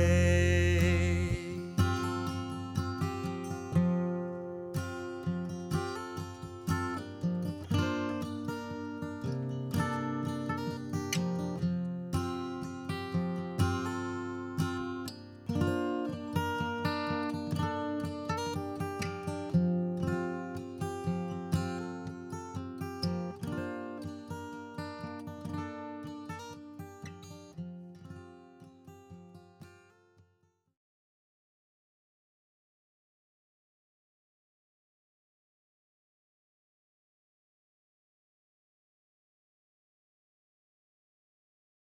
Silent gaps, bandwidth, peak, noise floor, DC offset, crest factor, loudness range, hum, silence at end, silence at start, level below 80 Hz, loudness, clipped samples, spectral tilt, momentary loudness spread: none; 16.5 kHz; -14 dBFS; -73 dBFS; under 0.1%; 22 dB; 10 LU; none; 12.1 s; 0 s; -52 dBFS; -34 LUFS; under 0.1%; -6.5 dB/octave; 13 LU